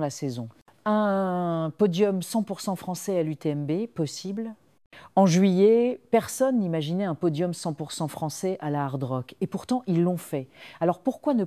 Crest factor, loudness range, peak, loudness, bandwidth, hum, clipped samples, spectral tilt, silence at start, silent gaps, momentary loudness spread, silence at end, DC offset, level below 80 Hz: 18 dB; 5 LU; -8 dBFS; -26 LUFS; 15 kHz; none; under 0.1%; -6.5 dB/octave; 0 s; 4.86-4.91 s; 12 LU; 0 s; under 0.1%; -70 dBFS